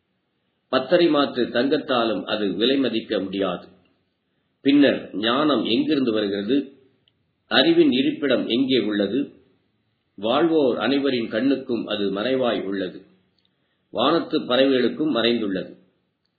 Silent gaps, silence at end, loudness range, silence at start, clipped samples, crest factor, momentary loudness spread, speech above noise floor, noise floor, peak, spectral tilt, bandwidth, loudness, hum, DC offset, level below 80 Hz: none; 0.65 s; 3 LU; 0.7 s; under 0.1%; 20 dB; 9 LU; 51 dB; -72 dBFS; -2 dBFS; -8 dB/octave; 4.8 kHz; -21 LUFS; none; under 0.1%; -68 dBFS